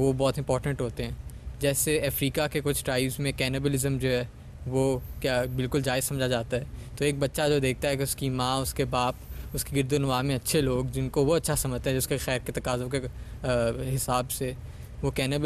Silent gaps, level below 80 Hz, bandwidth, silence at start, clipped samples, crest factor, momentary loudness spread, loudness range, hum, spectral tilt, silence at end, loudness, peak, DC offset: none; -42 dBFS; 14.5 kHz; 0 s; under 0.1%; 16 dB; 8 LU; 2 LU; none; -4.5 dB/octave; 0 s; -28 LUFS; -12 dBFS; under 0.1%